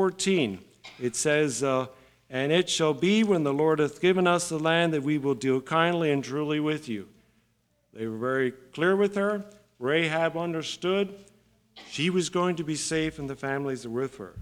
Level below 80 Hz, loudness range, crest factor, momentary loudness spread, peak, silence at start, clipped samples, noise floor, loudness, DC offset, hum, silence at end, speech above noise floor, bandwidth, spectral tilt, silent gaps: -64 dBFS; 5 LU; 20 dB; 11 LU; -8 dBFS; 0 s; under 0.1%; -70 dBFS; -26 LUFS; under 0.1%; none; 0 s; 44 dB; 15 kHz; -4.5 dB/octave; none